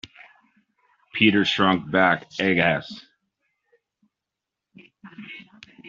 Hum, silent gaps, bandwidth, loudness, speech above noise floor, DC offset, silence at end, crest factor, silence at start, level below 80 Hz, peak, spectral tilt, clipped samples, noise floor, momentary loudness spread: none; none; 7.6 kHz; -20 LUFS; 65 dB; under 0.1%; 0 s; 24 dB; 1.15 s; -62 dBFS; -2 dBFS; -3 dB/octave; under 0.1%; -86 dBFS; 23 LU